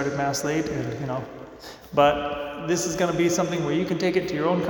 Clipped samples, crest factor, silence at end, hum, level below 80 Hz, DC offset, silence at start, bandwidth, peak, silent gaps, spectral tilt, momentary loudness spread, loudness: under 0.1%; 20 dB; 0 s; none; -52 dBFS; under 0.1%; 0 s; 19 kHz; -6 dBFS; none; -5 dB/octave; 11 LU; -25 LUFS